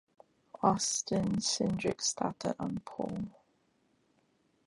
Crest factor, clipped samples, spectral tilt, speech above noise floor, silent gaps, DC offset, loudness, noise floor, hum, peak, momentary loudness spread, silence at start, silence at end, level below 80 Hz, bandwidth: 22 dB; under 0.1%; -4 dB/octave; 40 dB; none; under 0.1%; -33 LUFS; -73 dBFS; none; -14 dBFS; 9 LU; 0.6 s; 1.35 s; -62 dBFS; 11.5 kHz